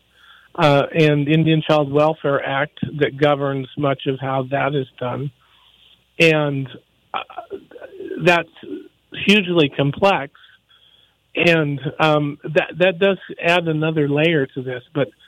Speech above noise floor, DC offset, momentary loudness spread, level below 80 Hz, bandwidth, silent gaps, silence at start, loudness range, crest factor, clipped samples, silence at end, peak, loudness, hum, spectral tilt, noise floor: 38 dB; under 0.1%; 16 LU; -58 dBFS; 12.5 kHz; none; 0.55 s; 4 LU; 16 dB; under 0.1%; 0.2 s; -4 dBFS; -18 LUFS; none; -6.5 dB/octave; -56 dBFS